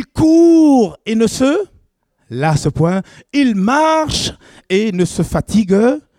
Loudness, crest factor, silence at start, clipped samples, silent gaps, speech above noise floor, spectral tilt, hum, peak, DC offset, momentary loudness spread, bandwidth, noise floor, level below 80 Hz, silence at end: -14 LUFS; 12 dB; 0 s; under 0.1%; none; 45 dB; -6 dB/octave; none; -2 dBFS; under 0.1%; 10 LU; 14.5 kHz; -60 dBFS; -38 dBFS; 0.2 s